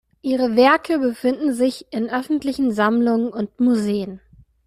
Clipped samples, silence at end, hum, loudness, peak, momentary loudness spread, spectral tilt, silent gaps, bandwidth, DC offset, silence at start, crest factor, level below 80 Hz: under 0.1%; 0.5 s; none; -20 LUFS; -2 dBFS; 9 LU; -5.5 dB/octave; none; 14.5 kHz; under 0.1%; 0.25 s; 16 dB; -58 dBFS